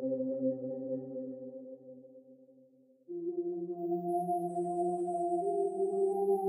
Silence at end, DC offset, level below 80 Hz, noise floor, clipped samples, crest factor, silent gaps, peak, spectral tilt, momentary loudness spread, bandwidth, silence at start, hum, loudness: 0 s; under 0.1%; under -90 dBFS; -64 dBFS; under 0.1%; 14 dB; none; -22 dBFS; -10.5 dB/octave; 15 LU; 12.5 kHz; 0 s; none; -35 LUFS